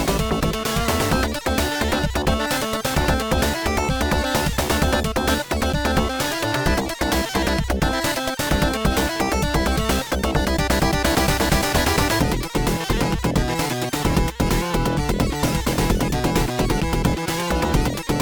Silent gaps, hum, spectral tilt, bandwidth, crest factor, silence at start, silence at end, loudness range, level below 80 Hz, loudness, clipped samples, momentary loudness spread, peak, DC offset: none; none; -4.5 dB/octave; over 20 kHz; 16 dB; 0 s; 0 s; 2 LU; -28 dBFS; -21 LUFS; under 0.1%; 3 LU; -6 dBFS; under 0.1%